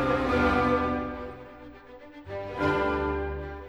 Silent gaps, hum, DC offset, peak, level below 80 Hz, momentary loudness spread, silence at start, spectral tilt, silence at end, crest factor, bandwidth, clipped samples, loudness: none; none; under 0.1%; -12 dBFS; -42 dBFS; 23 LU; 0 s; -7 dB/octave; 0 s; 16 dB; 12 kHz; under 0.1%; -27 LUFS